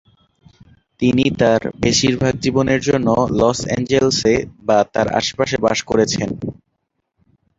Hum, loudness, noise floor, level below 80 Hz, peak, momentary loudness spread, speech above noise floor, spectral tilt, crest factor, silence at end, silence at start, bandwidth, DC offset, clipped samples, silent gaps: none; -17 LUFS; -72 dBFS; -42 dBFS; 0 dBFS; 5 LU; 56 dB; -4.5 dB/octave; 18 dB; 1.05 s; 1 s; 8 kHz; under 0.1%; under 0.1%; none